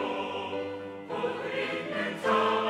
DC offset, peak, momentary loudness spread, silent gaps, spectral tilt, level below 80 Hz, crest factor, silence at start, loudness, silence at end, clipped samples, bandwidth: under 0.1%; -14 dBFS; 10 LU; none; -5 dB/octave; -80 dBFS; 18 dB; 0 s; -31 LUFS; 0 s; under 0.1%; 14 kHz